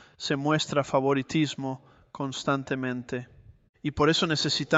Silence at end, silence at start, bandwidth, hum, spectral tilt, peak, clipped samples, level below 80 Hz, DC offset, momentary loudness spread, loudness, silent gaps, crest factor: 0 s; 0.2 s; 8.2 kHz; none; -4.5 dB/octave; -8 dBFS; under 0.1%; -56 dBFS; under 0.1%; 12 LU; -27 LUFS; 3.69-3.73 s; 20 dB